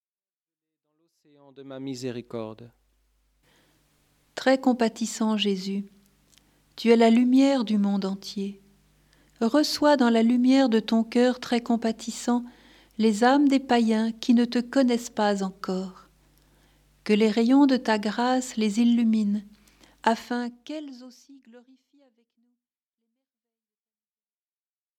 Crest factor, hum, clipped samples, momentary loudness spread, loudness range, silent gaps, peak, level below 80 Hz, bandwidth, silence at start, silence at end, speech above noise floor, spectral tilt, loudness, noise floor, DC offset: 20 dB; none; under 0.1%; 16 LU; 11 LU; none; -6 dBFS; -66 dBFS; 13.5 kHz; 1.6 s; 3.4 s; over 67 dB; -5 dB/octave; -23 LUFS; under -90 dBFS; under 0.1%